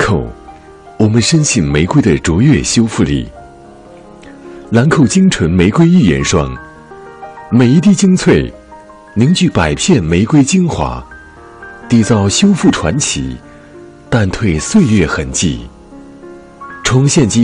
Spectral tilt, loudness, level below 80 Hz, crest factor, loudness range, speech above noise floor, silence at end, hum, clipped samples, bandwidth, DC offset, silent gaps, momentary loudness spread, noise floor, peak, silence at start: -5.5 dB/octave; -11 LUFS; -32 dBFS; 12 dB; 3 LU; 26 dB; 0 s; none; under 0.1%; 10.5 kHz; under 0.1%; none; 17 LU; -36 dBFS; 0 dBFS; 0 s